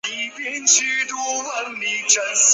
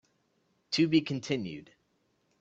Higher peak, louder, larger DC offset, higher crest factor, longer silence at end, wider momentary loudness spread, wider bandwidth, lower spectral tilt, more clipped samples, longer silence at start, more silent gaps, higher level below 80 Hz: first, -2 dBFS vs -12 dBFS; first, -18 LUFS vs -30 LUFS; neither; about the same, 18 dB vs 20 dB; second, 0 s vs 0.75 s; second, 11 LU vs 15 LU; about the same, 8.4 kHz vs 8 kHz; second, 2.5 dB/octave vs -5.5 dB/octave; neither; second, 0.05 s vs 0.7 s; neither; second, -78 dBFS vs -70 dBFS